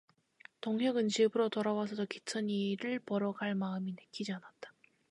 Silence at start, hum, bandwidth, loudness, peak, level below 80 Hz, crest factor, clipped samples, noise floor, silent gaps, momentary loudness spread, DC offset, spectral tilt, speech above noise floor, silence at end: 0.65 s; none; 11 kHz; -35 LUFS; -18 dBFS; -82 dBFS; 18 dB; under 0.1%; -61 dBFS; none; 13 LU; under 0.1%; -5.5 dB/octave; 27 dB; 0.45 s